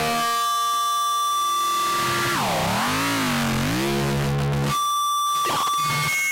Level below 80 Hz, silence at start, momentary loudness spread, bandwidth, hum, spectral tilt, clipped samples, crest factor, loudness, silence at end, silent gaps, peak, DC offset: -44 dBFS; 0 s; 1 LU; 16 kHz; none; -3.5 dB/octave; under 0.1%; 6 dB; -21 LUFS; 0 s; none; -16 dBFS; under 0.1%